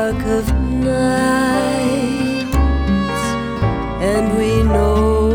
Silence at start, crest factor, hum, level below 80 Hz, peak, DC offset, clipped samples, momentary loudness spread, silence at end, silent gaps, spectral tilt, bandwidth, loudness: 0 s; 12 dB; none; -22 dBFS; -4 dBFS; under 0.1%; under 0.1%; 5 LU; 0 s; none; -6.5 dB/octave; 19 kHz; -17 LUFS